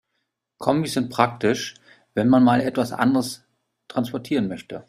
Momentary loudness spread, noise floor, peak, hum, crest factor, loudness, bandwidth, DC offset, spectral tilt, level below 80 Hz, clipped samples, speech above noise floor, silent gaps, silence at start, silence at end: 13 LU; -77 dBFS; -2 dBFS; none; 20 dB; -22 LUFS; 15 kHz; under 0.1%; -6 dB/octave; -60 dBFS; under 0.1%; 56 dB; none; 0.6 s; 0.05 s